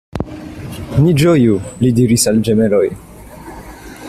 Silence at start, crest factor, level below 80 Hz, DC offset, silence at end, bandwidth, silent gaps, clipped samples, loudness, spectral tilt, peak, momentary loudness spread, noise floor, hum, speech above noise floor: 0.15 s; 14 dB; -38 dBFS; under 0.1%; 0 s; 14.5 kHz; none; under 0.1%; -13 LUFS; -6 dB/octave; 0 dBFS; 22 LU; -33 dBFS; none; 21 dB